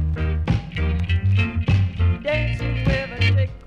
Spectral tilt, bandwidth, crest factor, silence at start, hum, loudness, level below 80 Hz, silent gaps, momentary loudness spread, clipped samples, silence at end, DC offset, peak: -7.5 dB/octave; 6.8 kHz; 12 dB; 0 s; none; -21 LUFS; -28 dBFS; none; 4 LU; under 0.1%; 0 s; under 0.1%; -8 dBFS